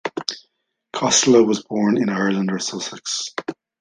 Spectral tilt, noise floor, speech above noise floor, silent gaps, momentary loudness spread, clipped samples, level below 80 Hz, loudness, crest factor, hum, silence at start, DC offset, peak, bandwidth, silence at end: -3.5 dB/octave; -69 dBFS; 50 dB; none; 16 LU; under 0.1%; -64 dBFS; -19 LUFS; 18 dB; none; 0.05 s; under 0.1%; -2 dBFS; 10 kHz; 0.3 s